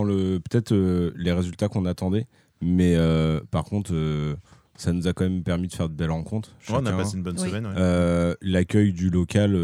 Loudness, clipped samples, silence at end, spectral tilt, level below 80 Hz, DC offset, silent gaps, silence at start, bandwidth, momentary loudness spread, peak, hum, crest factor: -24 LUFS; under 0.1%; 0 s; -7 dB/octave; -42 dBFS; under 0.1%; none; 0 s; 12 kHz; 8 LU; -6 dBFS; none; 18 dB